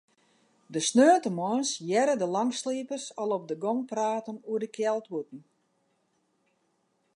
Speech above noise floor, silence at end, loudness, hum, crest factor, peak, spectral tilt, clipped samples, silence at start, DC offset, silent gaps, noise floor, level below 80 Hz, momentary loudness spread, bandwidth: 46 dB; 1.75 s; -28 LUFS; none; 20 dB; -8 dBFS; -4 dB/octave; under 0.1%; 0.7 s; under 0.1%; none; -73 dBFS; -84 dBFS; 13 LU; 11 kHz